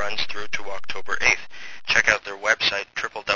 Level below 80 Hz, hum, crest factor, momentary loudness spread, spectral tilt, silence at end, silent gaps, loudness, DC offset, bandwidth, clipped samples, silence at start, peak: -52 dBFS; none; 22 dB; 14 LU; -1 dB/octave; 0 s; none; -22 LUFS; under 0.1%; 8 kHz; under 0.1%; 0 s; 0 dBFS